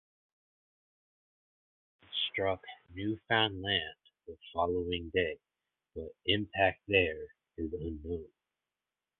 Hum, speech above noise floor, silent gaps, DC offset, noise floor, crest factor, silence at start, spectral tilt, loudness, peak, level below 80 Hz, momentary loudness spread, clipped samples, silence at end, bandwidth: none; over 56 dB; none; under 0.1%; under -90 dBFS; 24 dB; 2.1 s; -2 dB/octave; -33 LUFS; -12 dBFS; -56 dBFS; 17 LU; under 0.1%; 0.95 s; 4.4 kHz